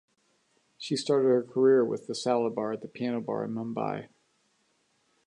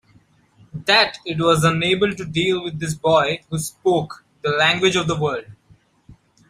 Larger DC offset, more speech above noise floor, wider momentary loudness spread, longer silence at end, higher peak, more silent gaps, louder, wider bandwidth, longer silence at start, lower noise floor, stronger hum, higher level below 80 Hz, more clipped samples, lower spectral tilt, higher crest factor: neither; first, 44 dB vs 36 dB; about the same, 11 LU vs 11 LU; first, 1.25 s vs 0.35 s; second, -12 dBFS vs -2 dBFS; neither; second, -28 LUFS vs -19 LUFS; second, 11 kHz vs 15.5 kHz; about the same, 0.8 s vs 0.75 s; first, -71 dBFS vs -55 dBFS; neither; second, -80 dBFS vs -52 dBFS; neither; about the same, -5.5 dB/octave vs -4.5 dB/octave; about the same, 18 dB vs 20 dB